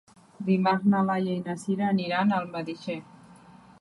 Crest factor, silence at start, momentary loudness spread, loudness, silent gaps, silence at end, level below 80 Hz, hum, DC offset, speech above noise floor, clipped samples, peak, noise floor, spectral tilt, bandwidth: 16 dB; 0.4 s; 12 LU; -27 LUFS; none; 0.3 s; -70 dBFS; none; under 0.1%; 26 dB; under 0.1%; -12 dBFS; -52 dBFS; -7 dB/octave; 11.5 kHz